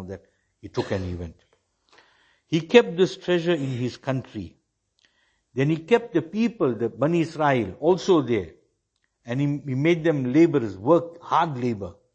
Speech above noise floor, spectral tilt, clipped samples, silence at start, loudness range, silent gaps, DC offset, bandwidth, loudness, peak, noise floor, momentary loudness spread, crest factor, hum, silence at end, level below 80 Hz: 51 dB; -7 dB/octave; under 0.1%; 0 s; 4 LU; none; under 0.1%; 8.4 kHz; -23 LUFS; -2 dBFS; -74 dBFS; 14 LU; 22 dB; none; 0.25 s; -58 dBFS